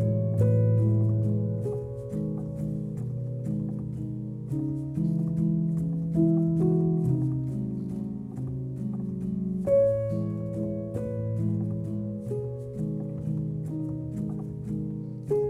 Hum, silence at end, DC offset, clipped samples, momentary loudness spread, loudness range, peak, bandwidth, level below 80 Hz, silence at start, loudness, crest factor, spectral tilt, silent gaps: none; 0 s; under 0.1%; under 0.1%; 10 LU; 6 LU; -12 dBFS; 2.6 kHz; -52 dBFS; 0 s; -29 LUFS; 16 dB; -11.5 dB/octave; none